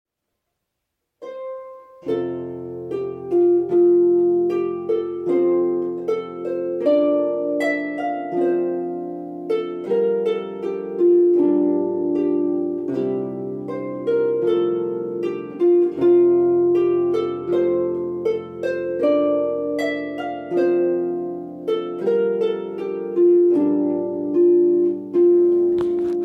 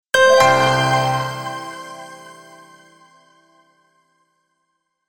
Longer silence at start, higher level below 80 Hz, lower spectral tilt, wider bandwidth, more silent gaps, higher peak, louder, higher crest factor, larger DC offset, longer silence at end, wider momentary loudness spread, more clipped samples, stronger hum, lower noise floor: first, 1.2 s vs 0.15 s; second, -68 dBFS vs -56 dBFS; first, -8 dB/octave vs -3.5 dB/octave; second, 4.9 kHz vs 19 kHz; neither; second, -8 dBFS vs -2 dBFS; second, -20 LUFS vs -16 LUFS; second, 12 dB vs 20 dB; neither; second, 0 s vs 2.75 s; second, 12 LU vs 24 LU; neither; neither; first, -79 dBFS vs -72 dBFS